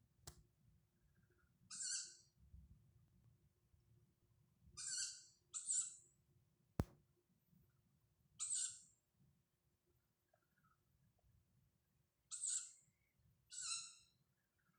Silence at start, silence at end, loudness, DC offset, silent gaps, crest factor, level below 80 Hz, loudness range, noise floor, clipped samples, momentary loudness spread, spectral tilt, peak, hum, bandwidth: 0.25 s; 0.75 s; -46 LUFS; under 0.1%; none; 32 dB; -72 dBFS; 6 LU; -85 dBFS; under 0.1%; 19 LU; -1.5 dB/octave; -24 dBFS; none; 15.5 kHz